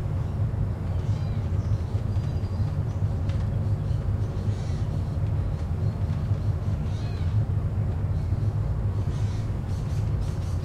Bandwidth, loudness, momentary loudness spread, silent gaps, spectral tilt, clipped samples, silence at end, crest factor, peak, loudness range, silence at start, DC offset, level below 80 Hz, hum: 8.6 kHz; -28 LUFS; 2 LU; none; -8.5 dB/octave; under 0.1%; 0 s; 12 dB; -14 dBFS; 1 LU; 0 s; under 0.1%; -34 dBFS; none